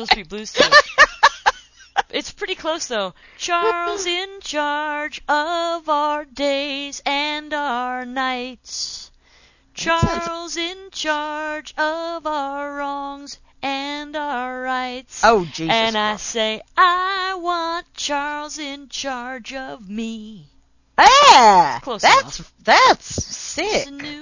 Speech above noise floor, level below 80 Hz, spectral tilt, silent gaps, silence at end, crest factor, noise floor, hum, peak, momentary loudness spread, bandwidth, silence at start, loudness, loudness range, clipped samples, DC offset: 34 dB; -46 dBFS; -2.5 dB/octave; none; 0 s; 20 dB; -54 dBFS; none; 0 dBFS; 16 LU; 8 kHz; 0 s; -18 LUFS; 12 LU; under 0.1%; under 0.1%